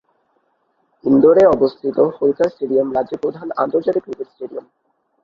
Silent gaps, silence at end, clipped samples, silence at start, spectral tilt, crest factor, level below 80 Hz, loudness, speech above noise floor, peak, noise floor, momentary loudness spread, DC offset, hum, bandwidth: none; 0.65 s; under 0.1%; 1.05 s; -8.5 dB/octave; 16 dB; -54 dBFS; -16 LUFS; 48 dB; 0 dBFS; -65 dBFS; 18 LU; under 0.1%; none; 7.2 kHz